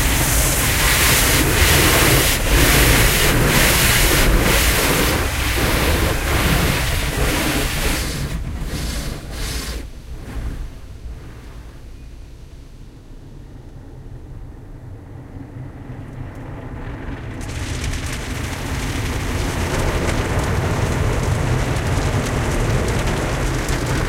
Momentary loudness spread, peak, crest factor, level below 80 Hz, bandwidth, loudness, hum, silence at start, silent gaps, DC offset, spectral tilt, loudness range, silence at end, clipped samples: 23 LU; 0 dBFS; 18 dB; -24 dBFS; 16 kHz; -17 LUFS; none; 0 s; none; under 0.1%; -3.5 dB/octave; 24 LU; 0 s; under 0.1%